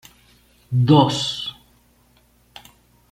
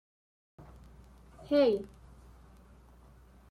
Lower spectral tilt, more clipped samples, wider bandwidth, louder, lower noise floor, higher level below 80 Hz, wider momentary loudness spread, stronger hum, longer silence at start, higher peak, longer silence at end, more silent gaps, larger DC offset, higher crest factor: about the same, -6.5 dB/octave vs -7 dB/octave; neither; first, 15 kHz vs 11 kHz; first, -19 LUFS vs -29 LUFS; about the same, -57 dBFS vs -57 dBFS; about the same, -56 dBFS vs -58 dBFS; second, 14 LU vs 28 LU; first, 60 Hz at -45 dBFS vs none; about the same, 0.7 s vs 0.6 s; first, -2 dBFS vs -16 dBFS; about the same, 1.6 s vs 1.65 s; neither; neither; about the same, 20 dB vs 20 dB